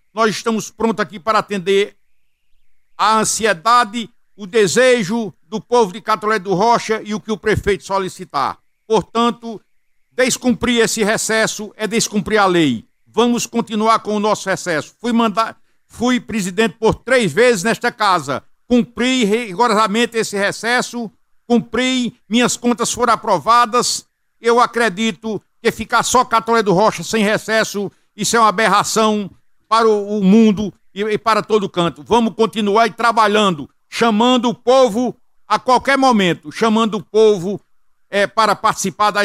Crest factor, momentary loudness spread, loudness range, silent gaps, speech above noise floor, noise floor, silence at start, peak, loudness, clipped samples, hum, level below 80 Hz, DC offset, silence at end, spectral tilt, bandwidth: 16 dB; 10 LU; 3 LU; none; 42 dB; -57 dBFS; 0.15 s; 0 dBFS; -16 LUFS; under 0.1%; none; -48 dBFS; under 0.1%; 0 s; -4 dB/octave; 16 kHz